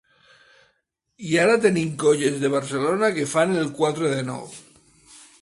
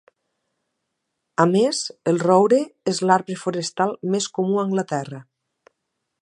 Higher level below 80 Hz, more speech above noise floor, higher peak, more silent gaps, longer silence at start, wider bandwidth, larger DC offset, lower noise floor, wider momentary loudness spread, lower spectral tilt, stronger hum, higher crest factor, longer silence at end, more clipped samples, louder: first, -64 dBFS vs -72 dBFS; second, 50 dB vs 58 dB; about the same, -4 dBFS vs -2 dBFS; neither; second, 1.2 s vs 1.4 s; about the same, 11.5 kHz vs 11 kHz; neither; second, -71 dBFS vs -78 dBFS; about the same, 11 LU vs 11 LU; about the same, -5 dB/octave vs -5 dB/octave; neither; about the same, 18 dB vs 20 dB; second, 0.8 s vs 1 s; neither; about the same, -21 LUFS vs -21 LUFS